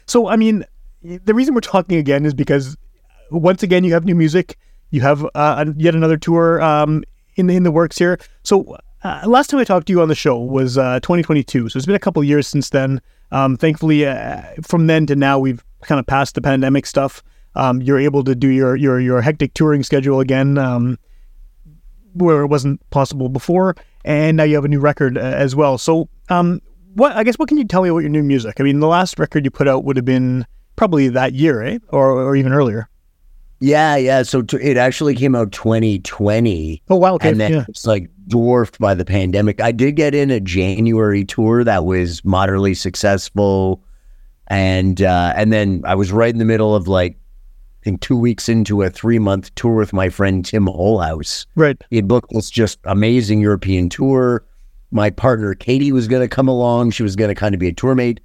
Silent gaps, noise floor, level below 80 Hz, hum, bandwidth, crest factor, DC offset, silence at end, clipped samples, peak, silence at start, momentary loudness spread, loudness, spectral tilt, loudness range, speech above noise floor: none; -47 dBFS; -40 dBFS; none; 14.5 kHz; 14 dB; under 0.1%; 0.1 s; under 0.1%; 0 dBFS; 0.1 s; 6 LU; -15 LUFS; -7 dB/octave; 2 LU; 32 dB